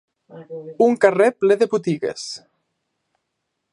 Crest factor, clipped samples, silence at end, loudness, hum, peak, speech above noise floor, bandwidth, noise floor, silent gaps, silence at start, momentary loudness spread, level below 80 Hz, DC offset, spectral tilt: 20 dB; under 0.1%; 1.35 s; -18 LUFS; none; 0 dBFS; 58 dB; 11 kHz; -77 dBFS; none; 0.35 s; 20 LU; -72 dBFS; under 0.1%; -5.5 dB/octave